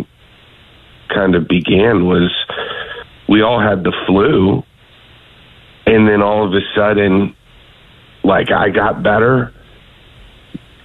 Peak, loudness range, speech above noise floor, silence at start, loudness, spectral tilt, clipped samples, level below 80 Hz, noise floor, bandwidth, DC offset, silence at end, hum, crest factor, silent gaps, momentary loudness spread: -2 dBFS; 2 LU; 33 dB; 0 s; -13 LUFS; -8.5 dB/octave; under 0.1%; -40 dBFS; -45 dBFS; 4.2 kHz; under 0.1%; 0.3 s; none; 14 dB; none; 12 LU